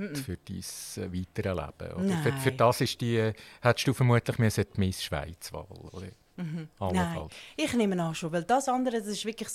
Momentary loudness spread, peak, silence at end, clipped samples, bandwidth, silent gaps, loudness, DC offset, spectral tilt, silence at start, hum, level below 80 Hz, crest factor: 15 LU; -8 dBFS; 0 s; under 0.1%; 15.5 kHz; none; -30 LUFS; under 0.1%; -5.5 dB/octave; 0 s; none; -54 dBFS; 22 dB